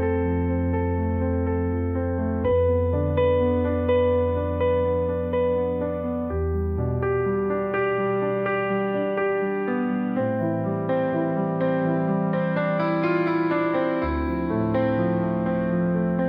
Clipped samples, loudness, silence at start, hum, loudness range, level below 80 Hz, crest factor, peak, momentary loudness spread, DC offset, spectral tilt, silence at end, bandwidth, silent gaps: under 0.1%; -24 LUFS; 0 s; none; 2 LU; -44 dBFS; 12 dB; -10 dBFS; 4 LU; under 0.1%; -11 dB/octave; 0 s; 5.2 kHz; none